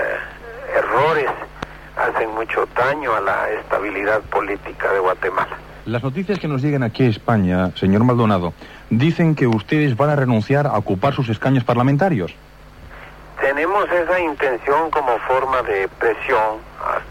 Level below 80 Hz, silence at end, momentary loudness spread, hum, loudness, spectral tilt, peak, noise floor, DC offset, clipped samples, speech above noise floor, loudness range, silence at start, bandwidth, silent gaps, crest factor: -44 dBFS; 0 s; 10 LU; none; -19 LUFS; -8 dB/octave; -4 dBFS; -40 dBFS; under 0.1%; under 0.1%; 22 dB; 3 LU; 0 s; 16 kHz; none; 14 dB